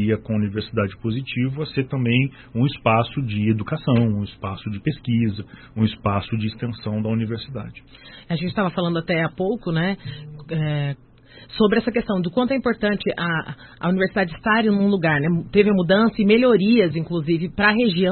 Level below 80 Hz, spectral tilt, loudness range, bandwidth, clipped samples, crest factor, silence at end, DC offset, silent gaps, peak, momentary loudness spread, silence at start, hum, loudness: -48 dBFS; -12 dB/octave; 7 LU; 4.4 kHz; under 0.1%; 18 dB; 0 s; under 0.1%; none; -2 dBFS; 12 LU; 0 s; none; -21 LUFS